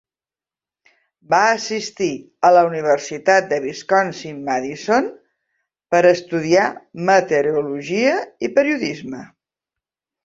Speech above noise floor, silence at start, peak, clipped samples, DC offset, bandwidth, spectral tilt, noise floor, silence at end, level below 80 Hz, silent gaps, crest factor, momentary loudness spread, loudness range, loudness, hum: over 72 dB; 1.3 s; -2 dBFS; under 0.1%; under 0.1%; 7.8 kHz; -4.5 dB/octave; under -90 dBFS; 1 s; -64 dBFS; none; 18 dB; 10 LU; 2 LU; -18 LUFS; none